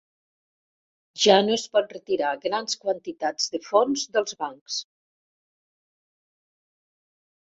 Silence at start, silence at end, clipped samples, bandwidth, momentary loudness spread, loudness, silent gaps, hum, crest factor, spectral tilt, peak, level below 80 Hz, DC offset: 1.15 s; 2.75 s; under 0.1%; 8 kHz; 13 LU; -24 LUFS; 4.61-4.66 s; none; 24 dB; -2.5 dB/octave; -4 dBFS; -74 dBFS; under 0.1%